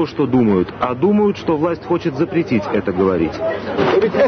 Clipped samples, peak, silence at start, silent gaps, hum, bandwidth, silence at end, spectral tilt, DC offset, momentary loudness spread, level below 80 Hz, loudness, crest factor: under 0.1%; -4 dBFS; 0 s; none; none; 6.4 kHz; 0 s; -8 dB/octave; under 0.1%; 5 LU; -46 dBFS; -17 LUFS; 12 dB